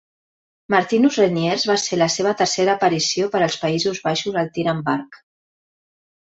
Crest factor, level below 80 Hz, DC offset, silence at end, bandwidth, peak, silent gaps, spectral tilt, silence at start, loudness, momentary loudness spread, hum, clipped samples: 18 dB; -62 dBFS; under 0.1%; 1.15 s; 8.2 kHz; -2 dBFS; none; -4 dB/octave; 0.7 s; -19 LUFS; 5 LU; none; under 0.1%